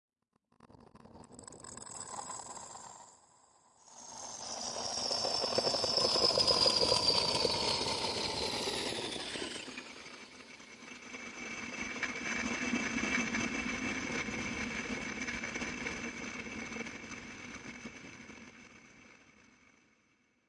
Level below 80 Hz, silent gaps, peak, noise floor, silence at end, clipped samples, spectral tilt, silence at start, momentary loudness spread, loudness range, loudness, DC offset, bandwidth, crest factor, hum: -62 dBFS; none; -14 dBFS; -77 dBFS; 1.35 s; under 0.1%; -2 dB/octave; 0.65 s; 22 LU; 19 LU; -33 LUFS; under 0.1%; 11.5 kHz; 22 dB; none